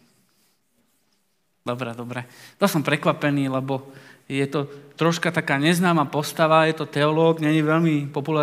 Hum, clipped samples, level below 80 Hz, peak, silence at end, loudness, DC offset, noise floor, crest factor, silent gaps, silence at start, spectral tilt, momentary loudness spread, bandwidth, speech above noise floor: none; under 0.1%; -74 dBFS; -2 dBFS; 0 s; -22 LUFS; under 0.1%; -71 dBFS; 20 dB; none; 1.65 s; -6 dB/octave; 13 LU; 16 kHz; 49 dB